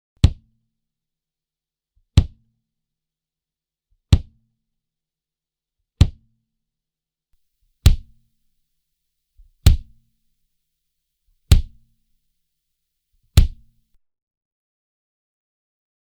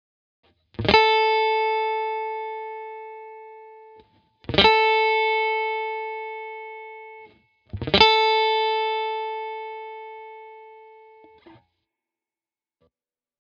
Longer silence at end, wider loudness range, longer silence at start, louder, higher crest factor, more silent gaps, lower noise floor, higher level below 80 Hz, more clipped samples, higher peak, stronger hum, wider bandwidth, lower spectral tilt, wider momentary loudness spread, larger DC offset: about the same, 2.55 s vs 2.6 s; second, 4 LU vs 9 LU; second, 0.25 s vs 0.8 s; about the same, -20 LUFS vs -21 LUFS; about the same, 24 dB vs 24 dB; neither; about the same, -89 dBFS vs under -90 dBFS; first, -26 dBFS vs -50 dBFS; neither; about the same, 0 dBFS vs 0 dBFS; neither; first, over 20 kHz vs 7 kHz; about the same, -5.5 dB/octave vs -4.5 dB/octave; second, 5 LU vs 24 LU; neither